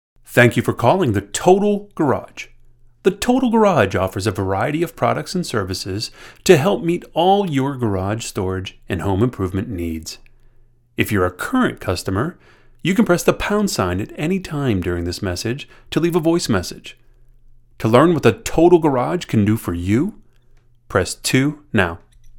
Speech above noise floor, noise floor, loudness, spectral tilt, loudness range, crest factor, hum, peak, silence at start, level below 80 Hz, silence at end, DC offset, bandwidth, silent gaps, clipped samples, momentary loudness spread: 33 dB; -50 dBFS; -18 LUFS; -5.5 dB/octave; 5 LU; 18 dB; none; 0 dBFS; 0.3 s; -44 dBFS; 0 s; under 0.1%; 18 kHz; none; under 0.1%; 11 LU